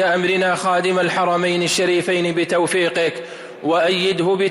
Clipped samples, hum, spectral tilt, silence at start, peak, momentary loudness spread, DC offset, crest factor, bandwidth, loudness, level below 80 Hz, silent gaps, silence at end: under 0.1%; none; -4 dB/octave; 0 s; -8 dBFS; 4 LU; under 0.1%; 10 dB; 15.5 kHz; -18 LUFS; -62 dBFS; none; 0 s